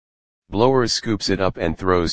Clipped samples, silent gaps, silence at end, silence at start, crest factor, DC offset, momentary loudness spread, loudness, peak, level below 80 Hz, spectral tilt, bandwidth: under 0.1%; none; 0 s; 0.4 s; 20 dB; under 0.1%; 6 LU; -20 LUFS; 0 dBFS; -42 dBFS; -5 dB/octave; 9.8 kHz